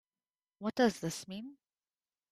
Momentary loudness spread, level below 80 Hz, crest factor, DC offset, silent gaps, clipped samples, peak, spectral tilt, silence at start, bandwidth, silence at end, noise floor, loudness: 15 LU; -74 dBFS; 24 dB; under 0.1%; none; under 0.1%; -14 dBFS; -4.5 dB/octave; 0.6 s; 15.5 kHz; 0.8 s; under -90 dBFS; -34 LUFS